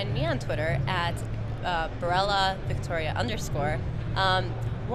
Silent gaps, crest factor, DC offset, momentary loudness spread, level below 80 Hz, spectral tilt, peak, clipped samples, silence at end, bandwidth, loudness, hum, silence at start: none; 18 dB; under 0.1%; 7 LU; -38 dBFS; -5.5 dB/octave; -10 dBFS; under 0.1%; 0 s; 13.5 kHz; -28 LUFS; none; 0 s